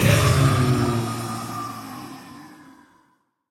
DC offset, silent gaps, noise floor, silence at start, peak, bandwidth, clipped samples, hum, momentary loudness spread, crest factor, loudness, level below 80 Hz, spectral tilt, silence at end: under 0.1%; none; -64 dBFS; 0 s; -4 dBFS; 17 kHz; under 0.1%; none; 23 LU; 20 dB; -21 LUFS; -40 dBFS; -5.5 dB/octave; 1 s